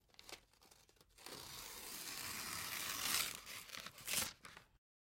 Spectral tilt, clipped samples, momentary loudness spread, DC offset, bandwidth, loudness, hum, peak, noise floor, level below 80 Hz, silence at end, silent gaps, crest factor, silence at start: 0 dB/octave; under 0.1%; 20 LU; under 0.1%; 17 kHz; -43 LUFS; none; -20 dBFS; -69 dBFS; -72 dBFS; 0.45 s; none; 28 dB; 0.2 s